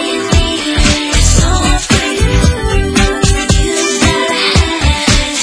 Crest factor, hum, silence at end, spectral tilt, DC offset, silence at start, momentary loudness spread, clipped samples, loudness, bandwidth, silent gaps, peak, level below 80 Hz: 10 dB; none; 0 s; -4 dB/octave; under 0.1%; 0 s; 2 LU; 0.2%; -11 LUFS; 11 kHz; none; 0 dBFS; -16 dBFS